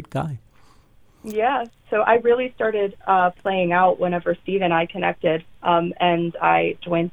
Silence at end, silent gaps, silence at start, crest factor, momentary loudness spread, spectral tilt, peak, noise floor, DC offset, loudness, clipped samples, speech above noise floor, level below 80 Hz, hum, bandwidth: 0.05 s; none; 0 s; 18 dB; 8 LU; -7.5 dB/octave; -4 dBFS; -53 dBFS; 0.3%; -21 LUFS; under 0.1%; 32 dB; -56 dBFS; none; 16.5 kHz